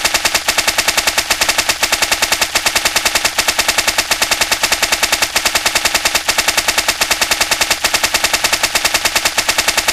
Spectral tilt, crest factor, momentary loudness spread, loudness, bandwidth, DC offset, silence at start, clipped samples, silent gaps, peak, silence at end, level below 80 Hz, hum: 0.5 dB/octave; 14 dB; 1 LU; -12 LUFS; 16 kHz; under 0.1%; 0 s; under 0.1%; none; 0 dBFS; 0 s; -38 dBFS; none